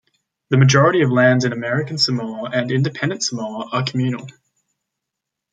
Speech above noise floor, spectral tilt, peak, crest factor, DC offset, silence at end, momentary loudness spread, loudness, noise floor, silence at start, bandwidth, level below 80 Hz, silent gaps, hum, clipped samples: 64 dB; -5 dB/octave; -2 dBFS; 18 dB; under 0.1%; 1.2 s; 10 LU; -18 LUFS; -82 dBFS; 0.5 s; 9.2 kHz; -60 dBFS; none; none; under 0.1%